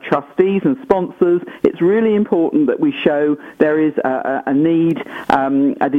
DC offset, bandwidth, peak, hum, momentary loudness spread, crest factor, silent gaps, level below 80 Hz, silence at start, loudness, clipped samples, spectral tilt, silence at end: under 0.1%; 6 kHz; 0 dBFS; none; 4 LU; 16 dB; none; -54 dBFS; 0.05 s; -16 LUFS; under 0.1%; -8.5 dB/octave; 0 s